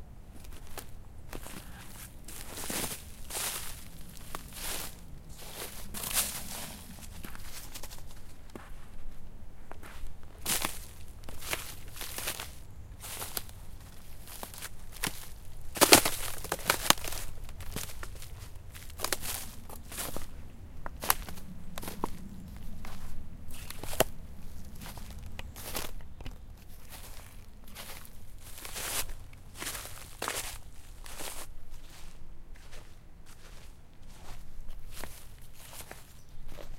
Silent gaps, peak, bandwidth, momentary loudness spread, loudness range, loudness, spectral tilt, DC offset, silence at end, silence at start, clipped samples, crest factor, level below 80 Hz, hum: none; 0 dBFS; 17 kHz; 21 LU; 20 LU; -34 LUFS; -2 dB/octave; under 0.1%; 0 s; 0 s; under 0.1%; 36 dB; -44 dBFS; none